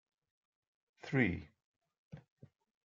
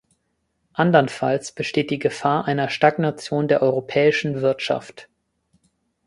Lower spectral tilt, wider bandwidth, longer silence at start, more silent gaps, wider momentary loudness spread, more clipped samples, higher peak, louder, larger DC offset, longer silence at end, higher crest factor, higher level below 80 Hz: first, -8 dB/octave vs -6 dB/octave; second, 7.4 kHz vs 11.5 kHz; first, 1.05 s vs 0.75 s; first, 1.64-1.74 s, 1.98-2.11 s vs none; first, 24 LU vs 7 LU; neither; second, -16 dBFS vs -2 dBFS; second, -36 LUFS vs -21 LUFS; neither; second, 0.65 s vs 1.05 s; first, 26 dB vs 20 dB; second, -72 dBFS vs -62 dBFS